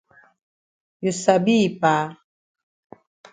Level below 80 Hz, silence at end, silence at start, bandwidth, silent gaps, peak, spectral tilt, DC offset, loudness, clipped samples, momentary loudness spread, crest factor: -66 dBFS; 1.2 s; 1 s; 9.4 kHz; none; -2 dBFS; -5 dB/octave; under 0.1%; -20 LUFS; under 0.1%; 10 LU; 22 dB